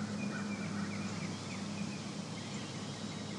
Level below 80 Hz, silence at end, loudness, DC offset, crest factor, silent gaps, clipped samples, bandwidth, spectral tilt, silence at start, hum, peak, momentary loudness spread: -72 dBFS; 0 s; -40 LUFS; under 0.1%; 12 dB; none; under 0.1%; 11.5 kHz; -4.5 dB/octave; 0 s; none; -28 dBFS; 3 LU